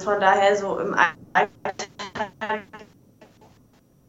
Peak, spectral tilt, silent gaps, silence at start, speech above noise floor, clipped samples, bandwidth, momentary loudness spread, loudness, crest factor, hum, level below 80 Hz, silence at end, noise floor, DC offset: -2 dBFS; -3.5 dB/octave; none; 0 s; 35 dB; under 0.1%; 8.2 kHz; 14 LU; -23 LUFS; 22 dB; none; -62 dBFS; 1.25 s; -57 dBFS; under 0.1%